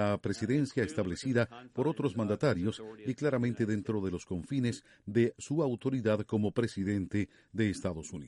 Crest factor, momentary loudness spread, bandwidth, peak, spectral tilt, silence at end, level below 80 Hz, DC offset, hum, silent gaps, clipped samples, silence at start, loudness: 18 dB; 6 LU; 11.5 kHz; -14 dBFS; -7 dB/octave; 0 s; -60 dBFS; under 0.1%; none; none; under 0.1%; 0 s; -33 LUFS